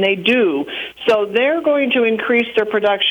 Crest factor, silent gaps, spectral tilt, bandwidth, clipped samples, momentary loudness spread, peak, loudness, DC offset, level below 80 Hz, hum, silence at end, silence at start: 14 dB; none; -5.5 dB/octave; 19 kHz; under 0.1%; 5 LU; -2 dBFS; -16 LUFS; under 0.1%; -60 dBFS; none; 0 s; 0 s